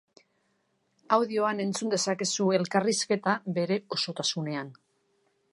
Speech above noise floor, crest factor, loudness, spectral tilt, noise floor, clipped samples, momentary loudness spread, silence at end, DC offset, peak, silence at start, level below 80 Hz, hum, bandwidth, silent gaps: 45 dB; 22 dB; -28 LUFS; -4 dB/octave; -73 dBFS; under 0.1%; 6 LU; 0.8 s; under 0.1%; -8 dBFS; 1.1 s; -80 dBFS; none; 11.5 kHz; none